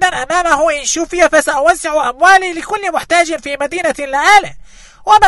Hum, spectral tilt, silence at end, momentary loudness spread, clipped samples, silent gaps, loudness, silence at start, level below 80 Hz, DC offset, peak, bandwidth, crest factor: none; -1.5 dB/octave; 0 s; 10 LU; 0.6%; none; -12 LUFS; 0 s; -40 dBFS; under 0.1%; 0 dBFS; 12.5 kHz; 12 dB